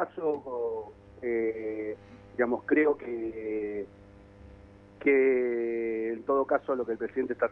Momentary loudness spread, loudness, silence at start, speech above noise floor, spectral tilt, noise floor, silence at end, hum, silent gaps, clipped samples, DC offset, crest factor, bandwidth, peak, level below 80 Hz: 13 LU; -30 LUFS; 0 s; 23 dB; -9 dB/octave; -52 dBFS; 0 s; none; none; under 0.1%; under 0.1%; 18 dB; 4 kHz; -12 dBFS; -62 dBFS